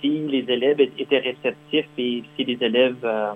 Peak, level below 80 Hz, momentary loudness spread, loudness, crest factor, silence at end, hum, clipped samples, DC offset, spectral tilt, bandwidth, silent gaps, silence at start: -4 dBFS; -72 dBFS; 7 LU; -22 LUFS; 18 dB; 0 s; none; under 0.1%; under 0.1%; -7 dB/octave; 7.8 kHz; none; 0 s